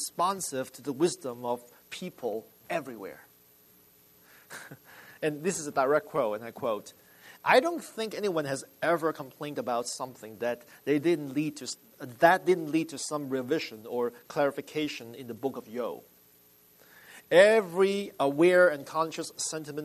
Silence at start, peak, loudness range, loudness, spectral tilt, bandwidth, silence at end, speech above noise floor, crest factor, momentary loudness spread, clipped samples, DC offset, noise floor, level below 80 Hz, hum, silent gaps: 0 s; -6 dBFS; 12 LU; -29 LUFS; -4 dB/octave; 13.5 kHz; 0 s; 31 dB; 24 dB; 17 LU; under 0.1%; under 0.1%; -60 dBFS; -78 dBFS; none; none